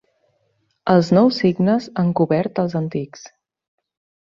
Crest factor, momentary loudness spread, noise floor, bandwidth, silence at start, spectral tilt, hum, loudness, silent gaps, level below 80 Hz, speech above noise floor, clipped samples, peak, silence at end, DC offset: 18 dB; 12 LU; -67 dBFS; 7.4 kHz; 0.85 s; -7.5 dB/octave; none; -18 LUFS; none; -58 dBFS; 49 dB; under 0.1%; -2 dBFS; 1.05 s; under 0.1%